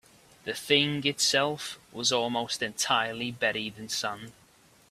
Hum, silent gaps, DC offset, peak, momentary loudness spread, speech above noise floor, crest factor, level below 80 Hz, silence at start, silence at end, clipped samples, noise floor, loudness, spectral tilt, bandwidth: none; none; under 0.1%; -6 dBFS; 13 LU; 31 dB; 24 dB; -68 dBFS; 0.45 s; 0.6 s; under 0.1%; -60 dBFS; -28 LUFS; -2.5 dB/octave; 15.5 kHz